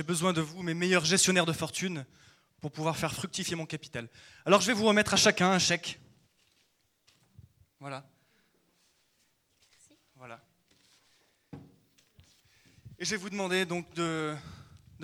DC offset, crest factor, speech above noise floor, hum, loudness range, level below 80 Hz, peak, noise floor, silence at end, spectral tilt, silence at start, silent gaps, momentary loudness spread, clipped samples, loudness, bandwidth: under 0.1%; 24 dB; 43 dB; none; 24 LU; -66 dBFS; -8 dBFS; -72 dBFS; 0 s; -3.5 dB/octave; 0 s; none; 25 LU; under 0.1%; -28 LUFS; 16 kHz